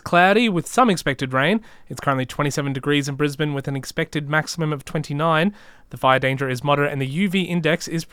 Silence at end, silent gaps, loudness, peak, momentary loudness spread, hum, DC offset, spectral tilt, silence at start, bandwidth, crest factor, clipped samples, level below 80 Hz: 0.05 s; none; -21 LUFS; -2 dBFS; 8 LU; none; under 0.1%; -5.5 dB/octave; 0.05 s; 16.5 kHz; 20 dB; under 0.1%; -52 dBFS